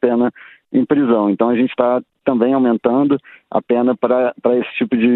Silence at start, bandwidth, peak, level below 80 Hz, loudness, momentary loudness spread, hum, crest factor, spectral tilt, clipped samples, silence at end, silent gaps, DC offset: 0.05 s; 4.1 kHz; 0 dBFS; -60 dBFS; -16 LUFS; 6 LU; none; 16 dB; -10.5 dB/octave; under 0.1%; 0 s; none; under 0.1%